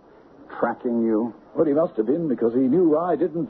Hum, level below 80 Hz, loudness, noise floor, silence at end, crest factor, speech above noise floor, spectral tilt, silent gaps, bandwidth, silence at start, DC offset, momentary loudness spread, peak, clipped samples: none; -64 dBFS; -22 LUFS; -49 dBFS; 0 s; 14 dB; 27 dB; -12 dB/octave; none; 4.2 kHz; 0.4 s; under 0.1%; 8 LU; -8 dBFS; under 0.1%